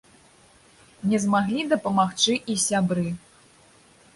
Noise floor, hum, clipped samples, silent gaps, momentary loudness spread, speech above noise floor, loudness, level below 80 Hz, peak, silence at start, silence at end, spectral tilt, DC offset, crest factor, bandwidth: -55 dBFS; none; under 0.1%; none; 8 LU; 32 dB; -23 LUFS; -60 dBFS; -8 dBFS; 1 s; 0.95 s; -4 dB/octave; under 0.1%; 18 dB; 11.5 kHz